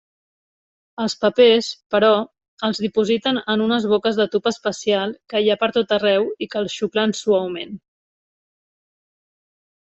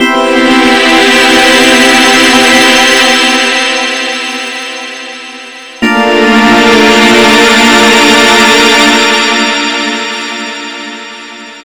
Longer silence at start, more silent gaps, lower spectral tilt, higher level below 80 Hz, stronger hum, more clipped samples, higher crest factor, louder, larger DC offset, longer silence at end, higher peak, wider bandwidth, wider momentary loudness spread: first, 1 s vs 0 s; first, 1.86-1.90 s, 2.48-2.57 s vs none; first, -4.5 dB/octave vs -2 dB/octave; second, -64 dBFS vs -40 dBFS; neither; second, under 0.1% vs 7%; first, 18 dB vs 6 dB; second, -19 LUFS vs -5 LUFS; second, under 0.1% vs 2%; first, 2.1 s vs 0.05 s; about the same, -2 dBFS vs 0 dBFS; second, 8.2 kHz vs over 20 kHz; second, 10 LU vs 17 LU